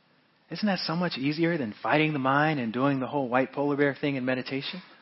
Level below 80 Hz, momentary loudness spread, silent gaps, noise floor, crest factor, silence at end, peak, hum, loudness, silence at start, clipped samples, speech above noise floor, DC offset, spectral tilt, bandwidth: -72 dBFS; 7 LU; none; -64 dBFS; 18 dB; 0.15 s; -8 dBFS; none; -27 LUFS; 0.5 s; under 0.1%; 37 dB; under 0.1%; -9 dB/octave; 6 kHz